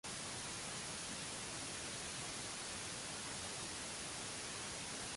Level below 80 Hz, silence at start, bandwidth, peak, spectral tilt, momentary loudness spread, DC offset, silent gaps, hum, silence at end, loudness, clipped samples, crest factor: -66 dBFS; 0.05 s; 11.5 kHz; -32 dBFS; -1.5 dB/octave; 0 LU; under 0.1%; none; none; 0 s; -44 LUFS; under 0.1%; 14 dB